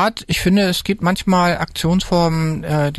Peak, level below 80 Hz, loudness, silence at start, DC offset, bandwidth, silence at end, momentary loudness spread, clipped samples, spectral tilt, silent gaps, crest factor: -6 dBFS; -36 dBFS; -17 LUFS; 0 s; under 0.1%; 12.5 kHz; 0 s; 4 LU; under 0.1%; -5.5 dB/octave; none; 10 dB